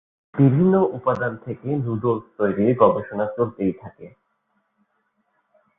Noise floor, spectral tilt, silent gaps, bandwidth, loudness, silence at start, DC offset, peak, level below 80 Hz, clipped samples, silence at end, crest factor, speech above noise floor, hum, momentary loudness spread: -70 dBFS; -11.5 dB/octave; none; 3.8 kHz; -21 LUFS; 0.35 s; under 0.1%; -2 dBFS; -56 dBFS; under 0.1%; 1.7 s; 20 dB; 50 dB; none; 11 LU